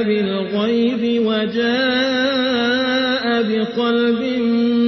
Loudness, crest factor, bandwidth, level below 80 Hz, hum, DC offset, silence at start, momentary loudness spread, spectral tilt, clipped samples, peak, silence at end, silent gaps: -18 LUFS; 10 dB; 6.2 kHz; -62 dBFS; none; under 0.1%; 0 s; 2 LU; -5.5 dB/octave; under 0.1%; -6 dBFS; 0 s; none